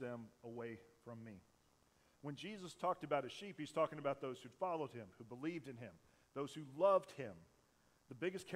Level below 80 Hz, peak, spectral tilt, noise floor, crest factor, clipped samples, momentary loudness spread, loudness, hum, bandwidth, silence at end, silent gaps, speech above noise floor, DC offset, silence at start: -82 dBFS; -24 dBFS; -6 dB/octave; -75 dBFS; 22 dB; under 0.1%; 17 LU; -44 LUFS; none; 15 kHz; 0 s; none; 31 dB; under 0.1%; 0 s